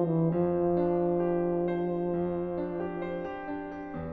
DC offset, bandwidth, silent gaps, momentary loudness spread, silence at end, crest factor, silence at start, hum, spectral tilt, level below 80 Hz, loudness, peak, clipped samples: under 0.1%; 4 kHz; none; 10 LU; 0 s; 14 dB; 0 s; none; -9 dB/octave; -56 dBFS; -30 LUFS; -16 dBFS; under 0.1%